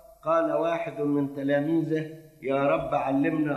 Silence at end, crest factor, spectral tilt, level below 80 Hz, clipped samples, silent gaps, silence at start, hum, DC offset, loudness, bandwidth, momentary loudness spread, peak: 0 s; 14 dB; -8 dB/octave; -60 dBFS; under 0.1%; none; 0.25 s; none; under 0.1%; -26 LUFS; 13 kHz; 5 LU; -12 dBFS